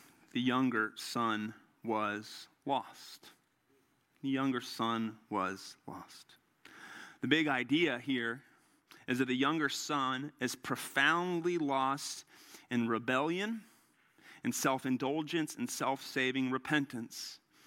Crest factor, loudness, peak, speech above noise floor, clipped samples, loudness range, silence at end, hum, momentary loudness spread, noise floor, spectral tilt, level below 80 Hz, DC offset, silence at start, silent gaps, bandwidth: 22 dB; -34 LUFS; -14 dBFS; 38 dB; under 0.1%; 6 LU; 0.3 s; none; 17 LU; -73 dBFS; -4 dB/octave; -82 dBFS; under 0.1%; 0.35 s; none; 16.5 kHz